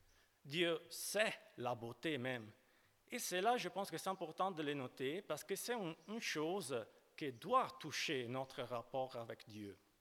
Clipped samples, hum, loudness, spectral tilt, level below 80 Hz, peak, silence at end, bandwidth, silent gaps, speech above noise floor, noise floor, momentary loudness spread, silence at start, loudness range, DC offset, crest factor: under 0.1%; none; -43 LUFS; -3.5 dB/octave; -84 dBFS; -20 dBFS; 0.25 s; 19 kHz; none; 30 dB; -73 dBFS; 11 LU; 0.45 s; 1 LU; under 0.1%; 24 dB